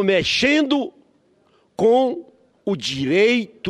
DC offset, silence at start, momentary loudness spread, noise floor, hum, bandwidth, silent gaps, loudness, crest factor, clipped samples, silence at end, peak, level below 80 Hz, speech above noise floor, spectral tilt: under 0.1%; 0 s; 15 LU; -59 dBFS; none; 11.5 kHz; none; -19 LUFS; 16 dB; under 0.1%; 0 s; -4 dBFS; -54 dBFS; 41 dB; -4.5 dB/octave